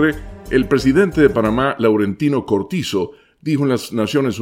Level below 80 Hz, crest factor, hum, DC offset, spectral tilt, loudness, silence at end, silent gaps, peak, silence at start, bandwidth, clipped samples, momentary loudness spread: -38 dBFS; 16 dB; none; under 0.1%; -6.5 dB/octave; -17 LUFS; 0 s; none; 0 dBFS; 0 s; 16.5 kHz; under 0.1%; 8 LU